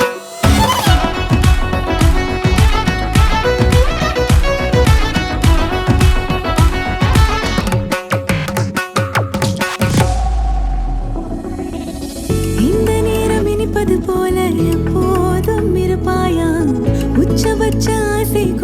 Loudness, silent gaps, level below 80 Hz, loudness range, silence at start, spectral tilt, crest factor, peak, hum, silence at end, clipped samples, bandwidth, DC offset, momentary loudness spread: -15 LUFS; none; -20 dBFS; 4 LU; 0 s; -5.5 dB/octave; 14 dB; 0 dBFS; none; 0 s; under 0.1%; 17 kHz; under 0.1%; 6 LU